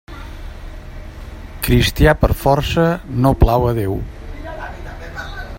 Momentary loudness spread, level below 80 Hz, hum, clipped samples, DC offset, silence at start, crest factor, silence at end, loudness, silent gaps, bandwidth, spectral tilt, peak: 21 LU; -24 dBFS; none; under 0.1%; under 0.1%; 0.1 s; 18 dB; 0 s; -16 LUFS; none; 16.5 kHz; -6 dB/octave; 0 dBFS